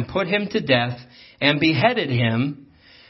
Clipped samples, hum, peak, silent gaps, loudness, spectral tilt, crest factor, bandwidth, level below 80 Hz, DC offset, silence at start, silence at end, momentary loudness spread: under 0.1%; none; -2 dBFS; none; -20 LUFS; -7.5 dB/octave; 20 dB; 6 kHz; -56 dBFS; under 0.1%; 0 s; 0.45 s; 10 LU